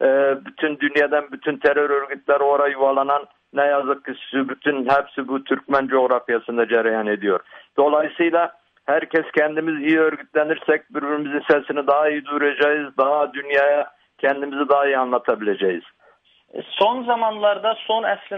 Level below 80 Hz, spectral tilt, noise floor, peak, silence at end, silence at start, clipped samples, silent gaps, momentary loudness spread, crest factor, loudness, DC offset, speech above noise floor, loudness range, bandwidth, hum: -66 dBFS; -6.5 dB/octave; -57 dBFS; -4 dBFS; 0 s; 0 s; under 0.1%; none; 7 LU; 16 dB; -20 LUFS; under 0.1%; 37 dB; 2 LU; 5.6 kHz; none